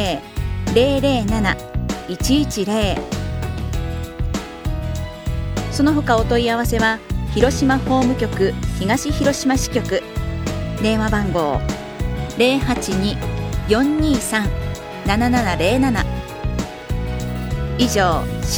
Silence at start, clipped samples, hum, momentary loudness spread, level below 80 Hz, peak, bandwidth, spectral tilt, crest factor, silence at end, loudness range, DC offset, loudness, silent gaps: 0 s; under 0.1%; none; 9 LU; -28 dBFS; 0 dBFS; over 20 kHz; -5.5 dB/octave; 18 dB; 0 s; 4 LU; under 0.1%; -20 LUFS; none